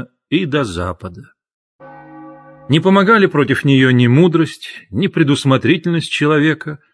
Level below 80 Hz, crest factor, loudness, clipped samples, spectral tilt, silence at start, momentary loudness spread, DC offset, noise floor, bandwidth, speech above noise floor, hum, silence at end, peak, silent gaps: -50 dBFS; 14 dB; -14 LUFS; under 0.1%; -6.5 dB/octave; 0 s; 13 LU; under 0.1%; -38 dBFS; 11 kHz; 24 dB; none; 0.15 s; 0 dBFS; 1.54-1.79 s